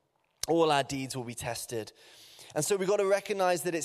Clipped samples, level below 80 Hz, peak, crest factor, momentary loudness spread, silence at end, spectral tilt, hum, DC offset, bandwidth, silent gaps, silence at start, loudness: under 0.1%; -66 dBFS; -12 dBFS; 18 dB; 12 LU; 0 s; -4 dB/octave; none; under 0.1%; 15 kHz; none; 0.45 s; -30 LUFS